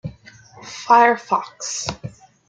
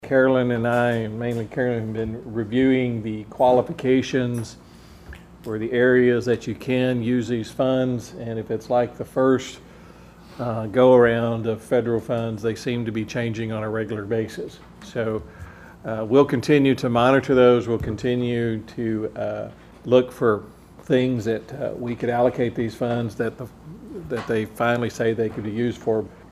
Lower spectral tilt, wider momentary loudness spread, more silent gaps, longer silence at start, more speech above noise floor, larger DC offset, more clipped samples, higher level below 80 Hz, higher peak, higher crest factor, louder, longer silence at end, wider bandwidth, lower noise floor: second, -3 dB/octave vs -7 dB/octave; first, 22 LU vs 13 LU; neither; about the same, 0.05 s vs 0 s; about the same, 27 dB vs 24 dB; neither; neither; about the same, -54 dBFS vs -50 dBFS; about the same, -2 dBFS vs -2 dBFS; about the same, 20 dB vs 20 dB; first, -18 LUFS vs -22 LUFS; first, 0.4 s vs 0.1 s; second, 9.4 kHz vs 13.5 kHz; about the same, -46 dBFS vs -45 dBFS